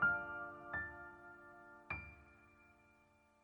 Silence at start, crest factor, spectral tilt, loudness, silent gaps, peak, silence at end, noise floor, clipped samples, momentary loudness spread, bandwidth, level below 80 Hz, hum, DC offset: 0 s; 20 dB; -7 dB/octave; -45 LUFS; none; -26 dBFS; 0.7 s; -72 dBFS; under 0.1%; 23 LU; 18.5 kHz; -66 dBFS; none; under 0.1%